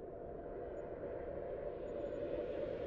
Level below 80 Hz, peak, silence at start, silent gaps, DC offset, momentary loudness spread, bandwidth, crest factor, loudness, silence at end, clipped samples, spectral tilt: -58 dBFS; -28 dBFS; 0 s; none; under 0.1%; 6 LU; 7.2 kHz; 14 dB; -45 LUFS; 0 s; under 0.1%; -6.5 dB/octave